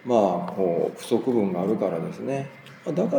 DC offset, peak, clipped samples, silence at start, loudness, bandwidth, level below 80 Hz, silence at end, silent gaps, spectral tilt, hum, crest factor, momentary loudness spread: under 0.1%; -6 dBFS; under 0.1%; 0.05 s; -25 LUFS; over 20 kHz; -74 dBFS; 0 s; none; -7.5 dB/octave; none; 18 dB; 9 LU